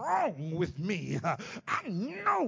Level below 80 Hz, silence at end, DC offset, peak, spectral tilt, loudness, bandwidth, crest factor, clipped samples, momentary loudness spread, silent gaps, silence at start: -62 dBFS; 0 s; under 0.1%; -16 dBFS; -6.5 dB/octave; -33 LUFS; 7.6 kHz; 16 dB; under 0.1%; 4 LU; none; 0 s